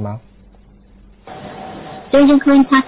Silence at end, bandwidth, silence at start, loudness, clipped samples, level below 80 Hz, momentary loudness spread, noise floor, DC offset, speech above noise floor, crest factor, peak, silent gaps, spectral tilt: 0.05 s; 4 kHz; 0 s; -11 LUFS; under 0.1%; -46 dBFS; 23 LU; -45 dBFS; under 0.1%; 34 dB; 14 dB; -2 dBFS; none; -10 dB/octave